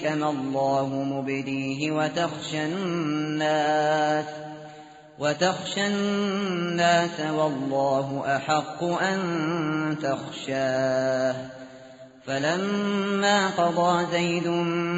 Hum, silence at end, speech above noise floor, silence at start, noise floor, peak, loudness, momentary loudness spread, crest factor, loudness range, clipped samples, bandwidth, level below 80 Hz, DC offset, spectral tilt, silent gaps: none; 0 s; 21 dB; 0 s; -46 dBFS; -8 dBFS; -25 LUFS; 7 LU; 18 dB; 2 LU; under 0.1%; 8 kHz; -66 dBFS; under 0.1%; -4 dB/octave; none